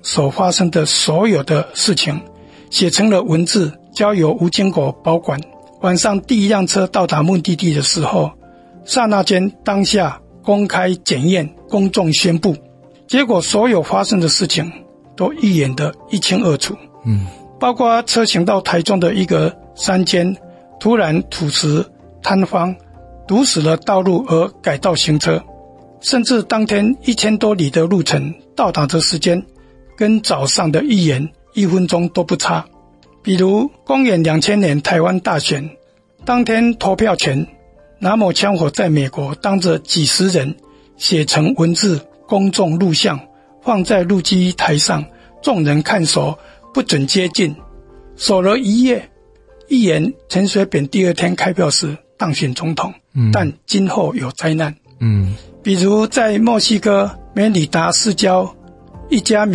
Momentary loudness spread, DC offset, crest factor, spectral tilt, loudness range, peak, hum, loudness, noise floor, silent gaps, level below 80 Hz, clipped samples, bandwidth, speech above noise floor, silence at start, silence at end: 8 LU; under 0.1%; 14 dB; -4.5 dB/octave; 2 LU; -2 dBFS; none; -15 LUFS; -47 dBFS; none; -48 dBFS; under 0.1%; 12 kHz; 33 dB; 0.05 s; 0 s